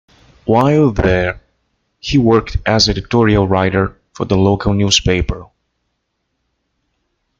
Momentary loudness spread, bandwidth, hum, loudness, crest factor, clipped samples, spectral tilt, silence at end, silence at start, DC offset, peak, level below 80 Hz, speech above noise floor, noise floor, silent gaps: 12 LU; 7.6 kHz; none; -14 LUFS; 16 dB; under 0.1%; -5 dB/octave; 1.95 s; 0.45 s; under 0.1%; 0 dBFS; -30 dBFS; 57 dB; -70 dBFS; none